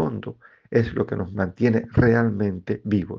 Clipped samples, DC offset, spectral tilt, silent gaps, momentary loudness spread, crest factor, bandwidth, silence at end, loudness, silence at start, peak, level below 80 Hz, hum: under 0.1%; under 0.1%; -9.5 dB/octave; none; 9 LU; 20 dB; 6.4 kHz; 0 s; -23 LUFS; 0 s; -2 dBFS; -46 dBFS; none